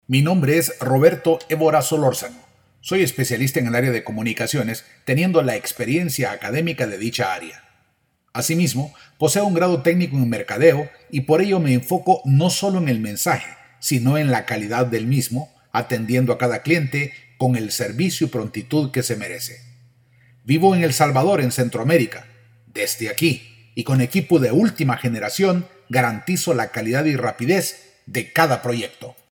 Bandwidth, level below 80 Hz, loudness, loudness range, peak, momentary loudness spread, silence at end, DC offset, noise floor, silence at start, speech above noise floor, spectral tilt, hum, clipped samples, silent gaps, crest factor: 20 kHz; -62 dBFS; -20 LUFS; 4 LU; -2 dBFS; 10 LU; 0.2 s; under 0.1%; -66 dBFS; 0.1 s; 47 dB; -5.5 dB/octave; none; under 0.1%; none; 18 dB